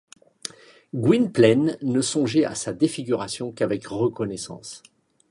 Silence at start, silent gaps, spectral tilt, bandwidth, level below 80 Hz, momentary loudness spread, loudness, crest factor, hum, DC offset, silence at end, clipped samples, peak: 0.45 s; none; -5.5 dB/octave; 11.5 kHz; -62 dBFS; 19 LU; -23 LUFS; 20 dB; none; under 0.1%; 0.5 s; under 0.1%; -4 dBFS